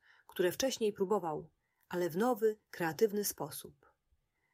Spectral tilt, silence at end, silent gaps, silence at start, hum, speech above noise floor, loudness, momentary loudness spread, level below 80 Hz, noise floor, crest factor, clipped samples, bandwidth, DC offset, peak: -4 dB/octave; 0.85 s; none; 0.35 s; none; 44 dB; -35 LUFS; 11 LU; -74 dBFS; -78 dBFS; 18 dB; under 0.1%; 16 kHz; under 0.1%; -18 dBFS